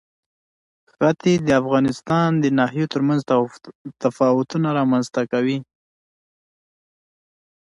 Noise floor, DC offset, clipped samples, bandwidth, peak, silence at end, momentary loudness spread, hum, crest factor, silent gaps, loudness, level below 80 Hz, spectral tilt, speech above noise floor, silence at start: under -90 dBFS; under 0.1%; under 0.1%; 11.5 kHz; -4 dBFS; 2 s; 7 LU; none; 16 dB; 3.75-3.85 s; -20 LUFS; -58 dBFS; -7 dB/octave; over 71 dB; 1 s